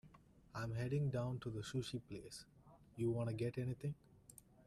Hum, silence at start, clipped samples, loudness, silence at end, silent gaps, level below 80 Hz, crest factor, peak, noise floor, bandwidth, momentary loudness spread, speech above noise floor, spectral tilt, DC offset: none; 0.05 s; under 0.1%; -44 LUFS; 0.25 s; none; -68 dBFS; 14 dB; -30 dBFS; -66 dBFS; 13.5 kHz; 20 LU; 23 dB; -7 dB/octave; under 0.1%